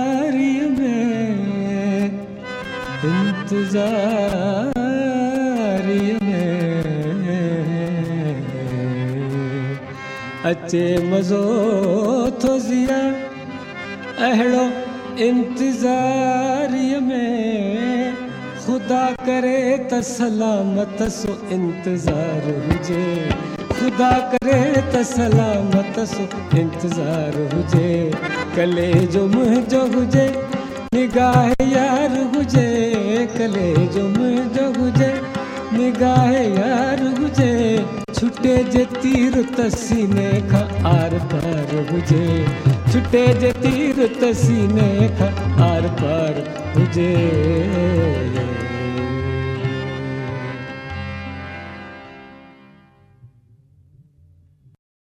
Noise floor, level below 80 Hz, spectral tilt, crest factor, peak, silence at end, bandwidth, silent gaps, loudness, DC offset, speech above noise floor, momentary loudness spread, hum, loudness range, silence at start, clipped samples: -52 dBFS; -42 dBFS; -7 dB/octave; 16 dB; -2 dBFS; 1.9 s; 13 kHz; none; -19 LUFS; under 0.1%; 35 dB; 9 LU; none; 5 LU; 0 s; under 0.1%